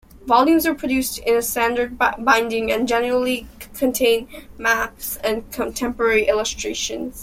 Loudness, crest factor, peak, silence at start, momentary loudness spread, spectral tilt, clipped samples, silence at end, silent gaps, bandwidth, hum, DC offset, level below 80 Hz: -20 LUFS; 18 dB; -2 dBFS; 0.15 s; 8 LU; -2.5 dB/octave; under 0.1%; 0 s; none; 16.5 kHz; none; under 0.1%; -44 dBFS